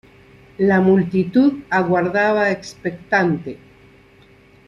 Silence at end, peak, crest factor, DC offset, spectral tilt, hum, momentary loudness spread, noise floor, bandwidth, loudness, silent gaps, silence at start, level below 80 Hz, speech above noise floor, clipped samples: 1.1 s; -4 dBFS; 16 dB; under 0.1%; -7.5 dB/octave; none; 11 LU; -49 dBFS; 7.2 kHz; -18 LUFS; none; 0.6 s; -56 dBFS; 32 dB; under 0.1%